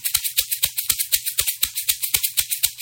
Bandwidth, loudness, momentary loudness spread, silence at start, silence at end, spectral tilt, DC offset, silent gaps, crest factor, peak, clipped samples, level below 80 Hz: 17 kHz; -20 LUFS; 2 LU; 0 s; 0 s; 2.5 dB/octave; under 0.1%; none; 22 dB; 0 dBFS; under 0.1%; -50 dBFS